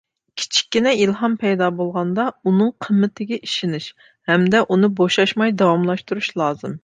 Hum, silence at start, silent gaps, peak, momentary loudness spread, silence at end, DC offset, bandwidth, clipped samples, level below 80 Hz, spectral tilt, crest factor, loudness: none; 0.35 s; none; -2 dBFS; 9 LU; 0.05 s; under 0.1%; 9.4 kHz; under 0.1%; -64 dBFS; -5 dB/octave; 16 dB; -19 LUFS